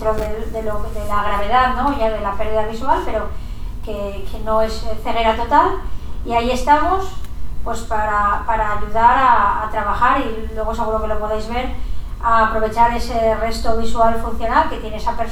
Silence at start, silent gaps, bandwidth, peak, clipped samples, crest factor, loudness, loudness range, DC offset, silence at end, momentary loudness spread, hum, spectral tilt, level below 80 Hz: 0 s; none; 16 kHz; 0 dBFS; under 0.1%; 16 dB; -18 LUFS; 4 LU; under 0.1%; 0 s; 13 LU; none; -5.5 dB/octave; -28 dBFS